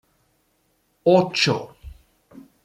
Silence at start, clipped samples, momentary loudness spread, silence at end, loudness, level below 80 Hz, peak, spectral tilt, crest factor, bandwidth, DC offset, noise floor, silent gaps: 1.05 s; under 0.1%; 12 LU; 0.75 s; -20 LUFS; -52 dBFS; -4 dBFS; -5 dB/octave; 20 dB; 13.5 kHz; under 0.1%; -67 dBFS; none